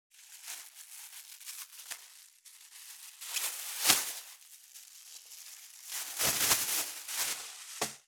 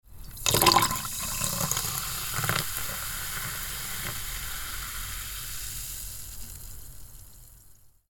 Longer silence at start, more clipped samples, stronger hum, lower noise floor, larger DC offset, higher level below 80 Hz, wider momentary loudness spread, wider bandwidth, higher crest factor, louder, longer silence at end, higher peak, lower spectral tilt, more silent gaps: about the same, 0.15 s vs 0.1 s; neither; neither; about the same, -57 dBFS vs -54 dBFS; neither; second, -72 dBFS vs -44 dBFS; first, 24 LU vs 20 LU; about the same, over 20 kHz vs 19 kHz; about the same, 32 dB vs 30 dB; second, -32 LUFS vs -28 LUFS; second, 0.05 s vs 0.2 s; about the same, -4 dBFS vs -2 dBFS; second, 1 dB/octave vs -2 dB/octave; neither